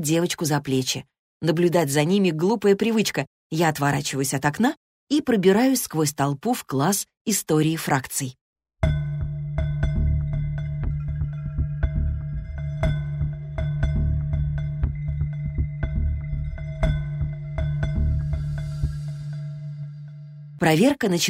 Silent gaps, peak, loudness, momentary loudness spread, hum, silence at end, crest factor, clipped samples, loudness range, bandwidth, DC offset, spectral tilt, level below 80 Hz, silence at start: 1.19-1.40 s, 3.27-3.50 s, 4.77-5.07 s, 7.17-7.25 s, 8.41-8.53 s; -6 dBFS; -24 LUFS; 11 LU; none; 0 s; 18 dB; under 0.1%; 6 LU; 16 kHz; under 0.1%; -5.5 dB/octave; -32 dBFS; 0 s